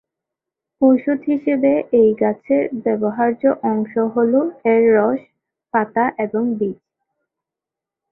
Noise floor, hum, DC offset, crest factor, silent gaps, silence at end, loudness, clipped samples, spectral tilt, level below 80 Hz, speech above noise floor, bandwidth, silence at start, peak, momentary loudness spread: -87 dBFS; none; under 0.1%; 16 dB; none; 1.4 s; -18 LUFS; under 0.1%; -11.5 dB/octave; -62 dBFS; 70 dB; 3.4 kHz; 0.8 s; -2 dBFS; 6 LU